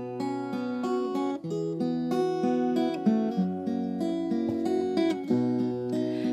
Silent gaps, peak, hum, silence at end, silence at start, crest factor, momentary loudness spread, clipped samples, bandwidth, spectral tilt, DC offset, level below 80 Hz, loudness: none; -12 dBFS; none; 0 s; 0 s; 16 dB; 5 LU; under 0.1%; 12 kHz; -7.5 dB/octave; under 0.1%; -74 dBFS; -28 LUFS